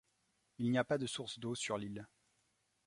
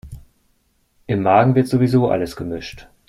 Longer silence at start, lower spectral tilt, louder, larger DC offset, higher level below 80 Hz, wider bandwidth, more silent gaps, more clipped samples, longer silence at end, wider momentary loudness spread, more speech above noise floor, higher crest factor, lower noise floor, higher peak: first, 0.6 s vs 0.05 s; second, -4.5 dB/octave vs -8 dB/octave; second, -39 LUFS vs -17 LUFS; neither; second, -74 dBFS vs -46 dBFS; second, 11.5 kHz vs 13.5 kHz; neither; neither; first, 0.8 s vs 0.25 s; second, 10 LU vs 14 LU; second, 41 dB vs 46 dB; about the same, 22 dB vs 18 dB; first, -80 dBFS vs -63 dBFS; second, -18 dBFS vs -2 dBFS